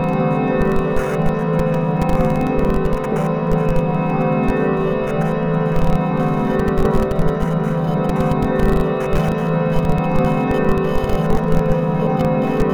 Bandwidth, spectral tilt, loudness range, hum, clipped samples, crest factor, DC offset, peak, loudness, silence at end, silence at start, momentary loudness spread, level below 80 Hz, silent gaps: 14.5 kHz; -8.5 dB/octave; 1 LU; none; under 0.1%; 14 dB; under 0.1%; -2 dBFS; -18 LUFS; 0 s; 0 s; 2 LU; -26 dBFS; none